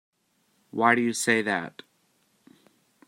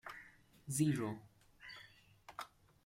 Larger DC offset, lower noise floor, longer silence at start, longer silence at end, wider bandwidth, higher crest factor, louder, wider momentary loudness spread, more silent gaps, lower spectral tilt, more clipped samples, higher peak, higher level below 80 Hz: neither; first, -70 dBFS vs -63 dBFS; first, 0.75 s vs 0.05 s; first, 1.4 s vs 0.4 s; about the same, 16 kHz vs 16 kHz; about the same, 24 dB vs 22 dB; first, -24 LUFS vs -40 LUFS; second, 14 LU vs 24 LU; neither; second, -3.5 dB/octave vs -5.5 dB/octave; neither; first, -4 dBFS vs -22 dBFS; about the same, -78 dBFS vs -74 dBFS